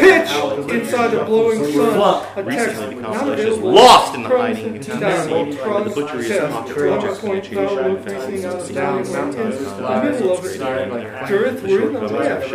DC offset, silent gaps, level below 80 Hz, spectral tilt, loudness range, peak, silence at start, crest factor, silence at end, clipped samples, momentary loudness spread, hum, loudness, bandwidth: under 0.1%; none; -54 dBFS; -4.5 dB/octave; 7 LU; 0 dBFS; 0 s; 16 dB; 0 s; under 0.1%; 10 LU; none; -17 LUFS; 16 kHz